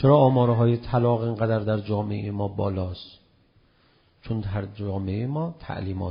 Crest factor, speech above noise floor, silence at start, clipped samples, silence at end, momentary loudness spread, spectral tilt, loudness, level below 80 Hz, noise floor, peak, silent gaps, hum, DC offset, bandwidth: 18 dB; 38 dB; 0 s; under 0.1%; 0 s; 12 LU; -8 dB/octave; -25 LUFS; -50 dBFS; -61 dBFS; -6 dBFS; none; none; under 0.1%; 5.2 kHz